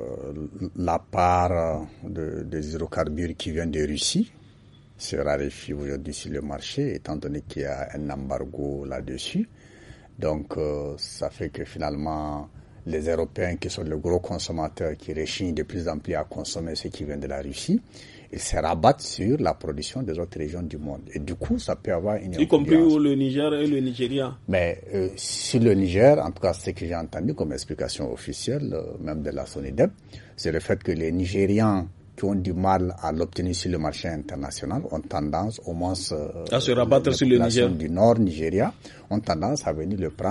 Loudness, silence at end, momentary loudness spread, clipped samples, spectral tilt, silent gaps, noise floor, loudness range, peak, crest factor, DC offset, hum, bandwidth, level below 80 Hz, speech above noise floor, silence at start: -26 LUFS; 0 s; 12 LU; under 0.1%; -5.5 dB/octave; none; -51 dBFS; 8 LU; -2 dBFS; 22 dB; under 0.1%; none; 11.5 kHz; -44 dBFS; 26 dB; 0 s